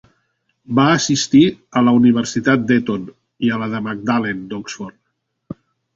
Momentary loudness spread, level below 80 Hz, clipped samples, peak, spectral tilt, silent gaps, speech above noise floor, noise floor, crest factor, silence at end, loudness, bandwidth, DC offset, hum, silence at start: 22 LU; -54 dBFS; under 0.1%; -2 dBFS; -5 dB/octave; none; 56 dB; -72 dBFS; 16 dB; 0.4 s; -16 LUFS; 7.8 kHz; under 0.1%; none; 0.7 s